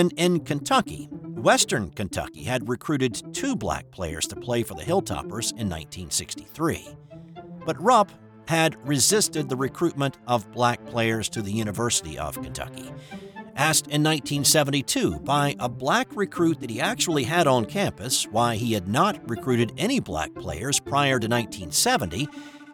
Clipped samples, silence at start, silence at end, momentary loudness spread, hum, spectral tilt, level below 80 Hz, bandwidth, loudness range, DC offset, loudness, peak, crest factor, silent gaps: under 0.1%; 0 s; 0 s; 13 LU; none; -3.5 dB/octave; -50 dBFS; 19 kHz; 5 LU; under 0.1%; -24 LUFS; -6 dBFS; 18 dB; none